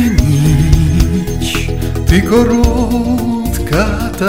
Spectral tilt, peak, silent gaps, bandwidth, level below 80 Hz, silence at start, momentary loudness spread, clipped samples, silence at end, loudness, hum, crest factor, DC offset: -6.5 dB/octave; 0 dBFS; none; 16.5 kHz; -18 dBFS; 0 s; 6 LU; 0.6%; 0 s; -13 LUFS; none; 12 dB; 2%